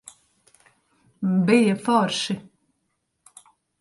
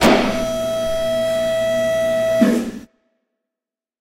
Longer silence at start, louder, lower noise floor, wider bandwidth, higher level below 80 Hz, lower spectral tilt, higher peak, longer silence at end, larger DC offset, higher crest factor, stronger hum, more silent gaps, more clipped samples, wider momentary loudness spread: first, 1.2 s vs 0 s; second, -22 LUFS vs -18 LUFS; second, -75 dBFS vs -88 dBFS; second, 11.5 kHz vs 16 kHz; second, -68 dBFS vs -42 dBFS; about the same, -5.5 dB/octave vs -4.5 dB/octave; second, -4 dBFS vs 0 dBFS; first, 1.4 s vs 1.15 s; neither; about the same, 22 dB vs 18 dB; neither; neither; neither; first, 11 LU vs 6 LU